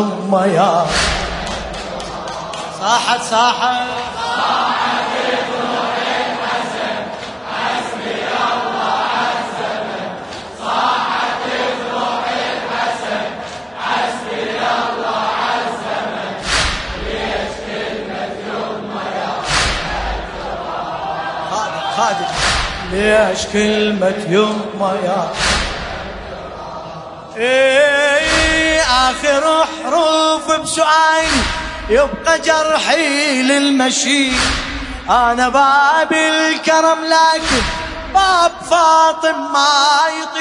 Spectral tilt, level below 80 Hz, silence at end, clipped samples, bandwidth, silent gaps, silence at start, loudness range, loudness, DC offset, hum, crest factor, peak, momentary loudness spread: -3 dB/octave; -34 dBFS; 0 s; under 0.1%; 11 kHz; none; 0 s; 7 LU; -15 LUFS; under 0.1%; none; 16 dB; 0 dBFS; 12 LU